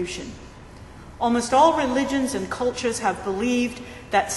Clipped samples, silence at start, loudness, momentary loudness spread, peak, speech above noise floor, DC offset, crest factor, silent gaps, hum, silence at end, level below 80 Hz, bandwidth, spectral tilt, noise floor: under 0.1%; 0 s; -23 LUFS; 25 LU; -6 dBFS; 20 dB; under 0.1%; 18 dB; none; none; 0 s; -46 dBFS; 12 kHz; -4 dB/octave; -42 dBFS